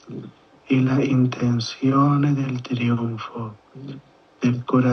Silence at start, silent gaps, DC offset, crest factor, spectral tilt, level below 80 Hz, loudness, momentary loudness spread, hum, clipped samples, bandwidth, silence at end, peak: 0.05 s; none; under 0.1%; 16 dB; -7.5 dB/octave; -64 dBFS; -21 LUFS; 20 LU; none; under 0.1%; 6.6 kHz; 0 s; -4 dBFS